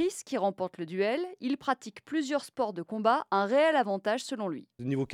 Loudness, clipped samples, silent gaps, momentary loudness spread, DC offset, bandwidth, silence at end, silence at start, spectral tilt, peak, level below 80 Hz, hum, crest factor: -30 LUFS; under 0.1%; none; 10 LU; under 0.1%; 15.5 kHz; 0 s; 0 s; -5 dB/octave; -12 dBFS; -74 dBFS; none; 18 dB